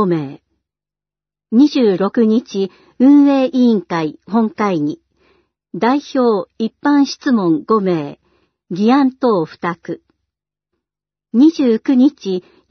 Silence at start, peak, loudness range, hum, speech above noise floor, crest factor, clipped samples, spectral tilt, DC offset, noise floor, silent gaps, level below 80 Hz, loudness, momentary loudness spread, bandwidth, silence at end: 0 s; -2 dBFS; 4 LU; 50 Hz at -50 dBFS; 75 dB; 14 dB; under 0.1%; -7 dB/octave; under 0.1%; -89 dBFS; none; -66 dBFS; -15 LUFS; 12 LU; 6.4 kHz; 0.3 s